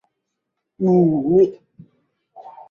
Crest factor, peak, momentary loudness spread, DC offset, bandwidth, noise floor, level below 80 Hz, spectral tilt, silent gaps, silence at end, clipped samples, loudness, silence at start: 16 dB; -6 dBFS; 5 LU; under 0.1%; 5.6 kHz; -78 dBFS; -60 dBFS; -11.5 dB/octave; none; 0.2 s; under 0.1%; -17 LUFS; 0.8 s